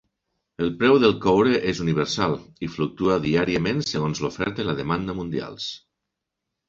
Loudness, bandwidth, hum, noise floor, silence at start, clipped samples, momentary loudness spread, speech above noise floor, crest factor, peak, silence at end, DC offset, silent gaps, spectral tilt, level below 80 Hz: -23 LUFS; 7.8 kHz; none; -83 dBFS; 0.6 s; under 0.1%; 12 LU; 60 dB; 20 dB; -4 dBFS; 0.9 s; under 0.1%; none; -6 dB/octave; -50 dBFS